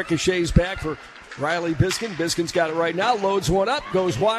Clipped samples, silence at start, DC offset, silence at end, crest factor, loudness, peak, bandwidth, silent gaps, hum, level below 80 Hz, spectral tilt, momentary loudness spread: under 0.1%; 0 s; under 0.1%; 0 s; 20 dB; -22 LUFS; -2 dBFS; 14 kHz; none; none; -36 dBFS; -5 dB/octave; 8 LU